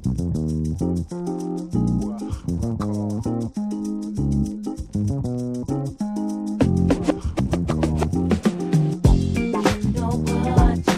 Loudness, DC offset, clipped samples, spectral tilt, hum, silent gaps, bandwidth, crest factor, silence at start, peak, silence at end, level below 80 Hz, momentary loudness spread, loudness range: -23 LUFS; under 0.1%; under 0.1%; -7.5 dB/octave; none; none; 13.5 kHz; 18 dB; 0 s; -4 dBFS; 0 s; -30 dBFS; 8 LU; 5 LU